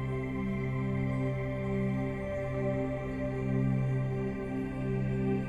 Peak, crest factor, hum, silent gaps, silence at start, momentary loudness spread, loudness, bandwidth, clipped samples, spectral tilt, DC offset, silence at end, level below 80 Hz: -20 dBFS; 12 dB; none; none; 0 s; 4 LU; -33 LUFS; 7.4 kHz; under 0.1%; -9.5 dB/octave; under 0.1%; 0 s; -46 dBFS